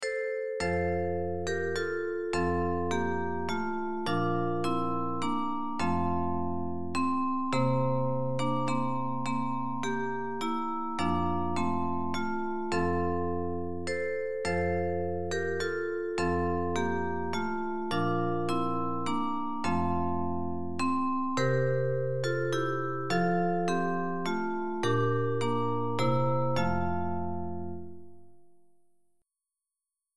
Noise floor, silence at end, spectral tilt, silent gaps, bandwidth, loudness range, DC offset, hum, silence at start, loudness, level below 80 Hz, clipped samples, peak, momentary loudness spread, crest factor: -90 dBFS; 0 s; -6.5 dB/octave; none; 12 kHz; 2 LU; 1%; none; 0 s; -31 LUFS; -54 dBFS; under 0.1%; -14 dBFS; 5 LU; 16 dB